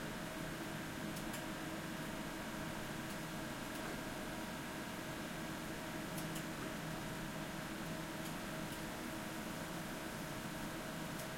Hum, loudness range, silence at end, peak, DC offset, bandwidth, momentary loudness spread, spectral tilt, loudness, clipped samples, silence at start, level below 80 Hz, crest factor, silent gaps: none; 0 LU; 0 s; -30 dBFS; under 0.1%; 16.5 kHz; 1 LU; -4 dB/octave; -44 LUFS; under 0.1%; 0 s; -60 dBFS; 14 dB; none